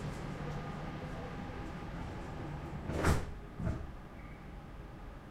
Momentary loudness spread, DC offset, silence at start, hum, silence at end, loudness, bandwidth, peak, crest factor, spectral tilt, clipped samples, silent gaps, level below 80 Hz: 16 LU; under 0.1%; 0 s; none; 0 s; -41 LUFS; 16 kHz; -18 dBFS; 22 dB; -6.5 dB/octave; under 0.1%; none; -46 dBFS